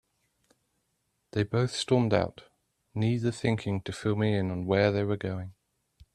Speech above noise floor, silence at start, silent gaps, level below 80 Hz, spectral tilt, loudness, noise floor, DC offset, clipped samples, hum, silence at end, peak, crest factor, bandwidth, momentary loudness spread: 49 dB; 1.35 s; none; -60 dBFS; -6.5 dB/octave; -29 LUFS; -77 dBFS; under 0.1%; under 0.1%; none; 0.65 s; -10 dBFS; 20 dB; 11 kHz; 11 LU